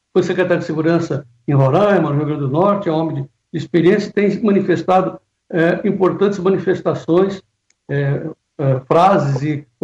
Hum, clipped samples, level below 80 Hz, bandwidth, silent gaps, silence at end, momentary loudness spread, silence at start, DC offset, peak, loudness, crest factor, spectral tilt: none; under 0.1%; -56 dBFS; 7.8 kHz; none; 0.2 s; 11 LU; 0.15 s; under 0.1%; -4 dBFS; -16 LUFS; 14 dB; -8 dB/octave